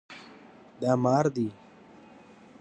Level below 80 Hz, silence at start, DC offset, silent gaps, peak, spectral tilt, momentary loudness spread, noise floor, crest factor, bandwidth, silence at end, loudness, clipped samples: -70 dBFS; 0.1 s; under 0.1%; none; -10 dBFS; -7.5 dB/octave; 23 LU; -53 dBFS; 20 dB; 8.4 kHz; 1.1 s; -27 LUFS; under 0.1%